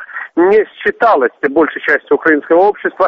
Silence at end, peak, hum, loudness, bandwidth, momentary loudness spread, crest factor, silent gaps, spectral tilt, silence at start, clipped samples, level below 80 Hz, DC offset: 0 s; 0 dBFS; none; -12 LUFS; 5.8 kHz; 4 LU; 12 dB; none; -7 dB/octave; 0 s; under 0.1%; -54 dBFS; under 0.1%